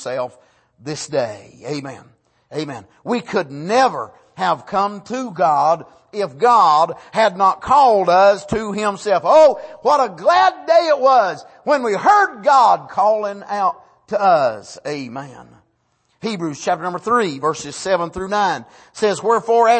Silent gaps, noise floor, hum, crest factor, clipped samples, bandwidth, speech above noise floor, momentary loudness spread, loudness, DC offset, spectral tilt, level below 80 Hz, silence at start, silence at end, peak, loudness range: none; -64 dBFS; none; 16 dB; under 0.1%; 8.8 kHz; 48 dB; 16 LU; -17 LUFS; under 0.1%; -4.5 dB/octave; -56 dBFS; 0 s; 0 s; -2 dBFS; 8 LU